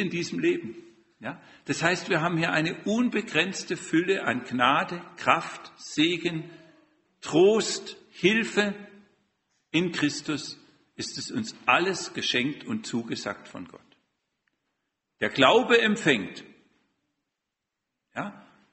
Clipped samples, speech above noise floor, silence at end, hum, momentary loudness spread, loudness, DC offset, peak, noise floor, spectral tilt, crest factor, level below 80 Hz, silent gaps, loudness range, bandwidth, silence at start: under 0.1%; 58 dB; 0.3 s; none; 18 LU; -26 LUFS; under 0.1%; -2 dBFS; -85 dBFS; -4 dB/octave; 26 dB; -68 dBFS; none; 3 LU; 8.4 kHz; 0 s